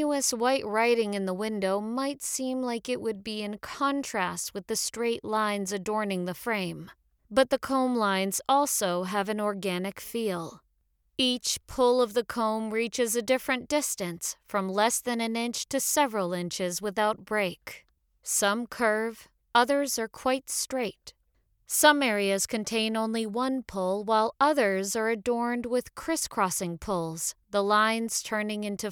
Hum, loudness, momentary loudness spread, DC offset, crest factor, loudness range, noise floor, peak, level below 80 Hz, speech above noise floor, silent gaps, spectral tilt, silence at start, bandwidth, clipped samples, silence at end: none; -28 LUFS; 8 LU; under 0.1%; 22 dB; 3 LU; -72 dBFS; -6 dBFS; -62 dBFS; 44 dB; none; -3 dB/octave; 0 s; over 20 kHz; under 0.1%; 0 s